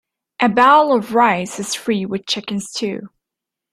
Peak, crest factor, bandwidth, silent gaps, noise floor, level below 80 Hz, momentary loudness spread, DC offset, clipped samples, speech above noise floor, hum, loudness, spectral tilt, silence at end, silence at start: -2 dBFS; 16 dB; 14.5 kHz; none; -84 dBFS; -62 dBFS; 13 LU; under 0.1%; under 0.1%; 67 dB; none; -17 LUFS; -4 dB/octave; 0.65 s; 0.4 s